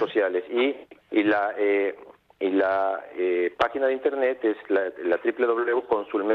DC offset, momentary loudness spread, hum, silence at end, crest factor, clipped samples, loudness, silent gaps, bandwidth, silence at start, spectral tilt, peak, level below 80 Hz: under 0.1%; 5 LU; none; 0 s; 18 dB; under 0.1%; -25 LUFS; none; 6 kHz; 0 s; -6.5 dB/octave; -8 dBFS; -66 dBFS